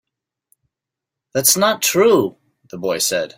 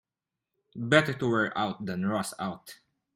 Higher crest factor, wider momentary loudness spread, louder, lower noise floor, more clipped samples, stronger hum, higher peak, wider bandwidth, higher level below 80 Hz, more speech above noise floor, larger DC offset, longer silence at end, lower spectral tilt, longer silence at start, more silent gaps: second, 18 dB vs 24 dB; about the same, 13 LU vs 15 LU; first, -16 LUFS vs -28 LUFS; second, -85 dBFS vs -89 dBFS; neither; neither; first, 0 dBFS vs -6 dBFS; about the same, 16.5 kHz vs 16.5 kHz; about the same, -64 dBFS vs -66 dBFS; first, 68 dB vs 60 dB; neither; second, 0.1 s vs 0.4 s; second, -2.5 dB/octave vs -5 dB/octave; first, 1.35 s vs 0.75 s; neither